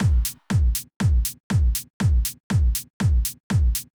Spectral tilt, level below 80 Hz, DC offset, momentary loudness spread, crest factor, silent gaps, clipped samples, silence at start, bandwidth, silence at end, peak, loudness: -5 dB/octave; -24 dBFS; under 0.1%; 3 LU; 10 dB; 0.96-1.00 s, 1.40-1.50 s, 1.90-2.00 s, 2.40-2.50 s, 2.90-3.00 s, 3.40-3.50 s; under 0.1%; 0 s; over 20 kHz; 0.15 s; -10 dBFS; -23 LUFS